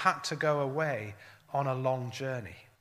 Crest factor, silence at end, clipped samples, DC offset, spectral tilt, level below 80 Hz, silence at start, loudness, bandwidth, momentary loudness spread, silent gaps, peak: 24 dB; 0.2 s; under 0.1%; under 0.1%; -5 dB/octave; -72 dBFS; 0 s; -32 LUFS; 15.5 kHz; 13 LU; none; -10 dBFS